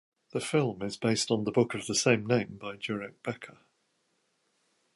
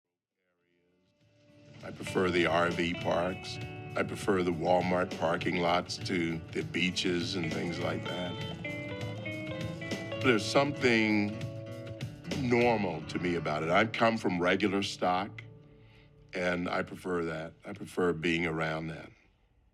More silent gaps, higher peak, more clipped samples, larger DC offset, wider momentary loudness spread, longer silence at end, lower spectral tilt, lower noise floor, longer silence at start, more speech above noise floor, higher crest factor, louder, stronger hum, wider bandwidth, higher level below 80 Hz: neither; first, -8 dBFS vs -12 dBFS; neither; neither; about the same, 13 LU vs 14 LU; first, 1.45 s vs 0.6 s; about the same, -4.5 dB/octave vs -5.5 dB/octave; second, -75 dBFS vs -82 dBFS; second, 0.35 s vs 1.7 s; second, 45 dB vs 52 dB; about the same, 22 dB vs 20 dB; about the same, -30 LUFS vs -31 LUFS; neither; second, 11.5 kHz vs 14.5 kHz; about the same, -68 dBFS vs -64 dBFS